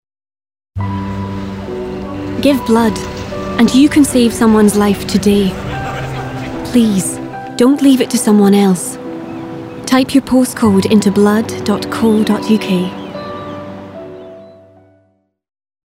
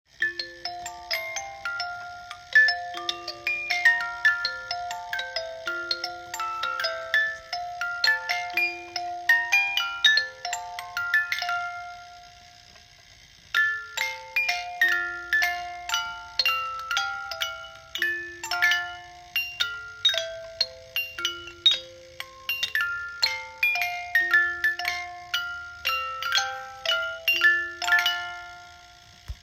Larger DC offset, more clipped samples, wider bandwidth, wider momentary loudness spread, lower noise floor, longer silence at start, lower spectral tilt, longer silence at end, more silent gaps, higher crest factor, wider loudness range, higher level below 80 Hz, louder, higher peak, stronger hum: neither; neither; about the same, 16.5 kHz vs 16.5 kHz; first, 16 LU vs 13 LU; first, -58 dBFS vs -52 dBFS; first, 0.75 s vs 0.2 s; first, -5.5 dB/octave vs 0.5 dB/octave; first, 1.35 s vs 0.05 s; neither; second, 14 dB vs 24 dB; about the same, 6 LU vs 5 LU; first, -38 dBFS vs -58 dBFS; first, -13 LUFS vs -25 LUFS; first, 0 dBFS vs -4 dBFS; neither